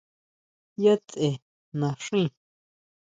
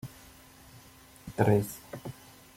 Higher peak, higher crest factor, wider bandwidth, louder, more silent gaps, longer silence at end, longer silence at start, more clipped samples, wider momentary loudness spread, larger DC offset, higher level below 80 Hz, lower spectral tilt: about the same, -8 dBFS vs -8 dBFS; second, 20 dB vs 26 dB; second, 9.2 kHz vs 16.5 kHz; first, -26 LUFS vs -29 LUFS; first, 1.42-1.72 s vs none; first, 0.85 s vs 0.45 s; first, 0.8 s vs 0.05 s; neither; second, 15 LU vs 27 LU; neither; second, -70 dBFS vs -58 dBFS; about the same, -6.5 dB/octave vs -7 dB/octave